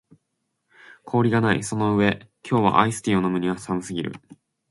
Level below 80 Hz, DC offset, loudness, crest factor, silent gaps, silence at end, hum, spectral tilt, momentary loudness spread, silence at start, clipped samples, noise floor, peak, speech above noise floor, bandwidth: -54 dBFS; under 0.1%; -22 LUFS; 22 dB; none; 0.55 s; none; -6 dB/octave; 11 LU; 1.05 s; under 0.1%; -76 dBFS; -2 dBFS; 55 dB; 11.5 kHz